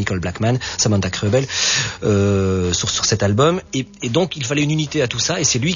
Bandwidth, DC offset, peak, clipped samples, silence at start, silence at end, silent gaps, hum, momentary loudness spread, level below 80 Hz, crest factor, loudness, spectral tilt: 7.4 kHz; under 0.1%; -2 dBFS; under 0.1%; 0 s; 0 s; none; none; 4 LU; -44 dBFS; 16 dB; -18 LUFS; -4 dB/octave